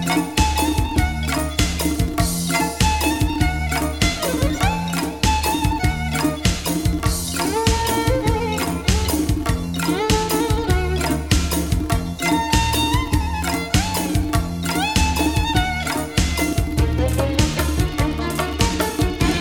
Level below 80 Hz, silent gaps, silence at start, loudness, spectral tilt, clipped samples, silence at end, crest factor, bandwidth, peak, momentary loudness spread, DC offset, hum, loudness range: -26 dBFS; none; 0 s; -20 LUFS; -4.5 dB/octave; under 0.1%; 0 s; 18 dB; 19 kHz; -2 dBFS; 3 LU; 0.3%; none; 1 LU